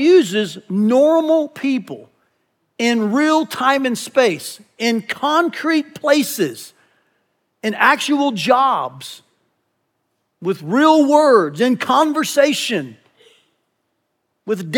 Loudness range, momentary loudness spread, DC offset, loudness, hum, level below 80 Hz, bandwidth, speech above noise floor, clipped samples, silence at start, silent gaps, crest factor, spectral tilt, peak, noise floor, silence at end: 4 LU; 13 LU; under 0.1%; -16 LUFS; none; -80 dBFS; 19 kHz; 55 dB; under 0.1%; 0 s; none; 16 dB; -4 dB/octave; -2 dBFS; -71 dBFS; 0 s